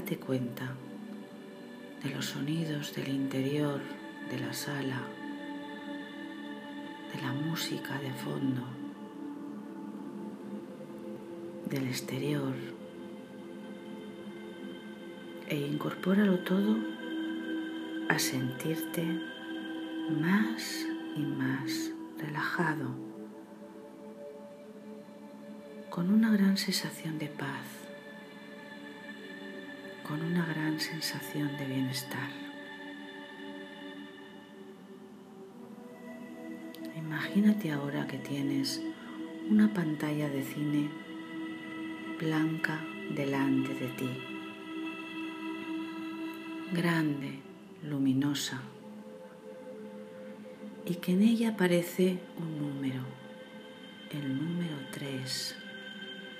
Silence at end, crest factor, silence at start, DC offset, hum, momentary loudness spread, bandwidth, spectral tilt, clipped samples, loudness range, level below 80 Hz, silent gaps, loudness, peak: 0 s; 24 dB; 0 s; under 0.1%; none; 19 LU; 15.5 kHz; -5.5 dB/octave; under 0.1%; 9 LU; -82 dBFS; none; -34 LUFS; -10 dBFS